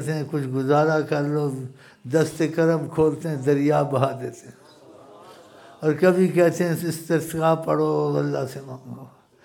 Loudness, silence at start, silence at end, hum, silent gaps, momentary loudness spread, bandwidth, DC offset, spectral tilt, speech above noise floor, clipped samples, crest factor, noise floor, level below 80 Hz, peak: -22 LUFS; 0 s; 0.35 s; none; none; 16 LU; 18 kHz; under 0.1%; -7 dB/octave; 26 dB; under 0.1%; 20 dB; -48 dBFS; -62 dBFS; -4 dBFS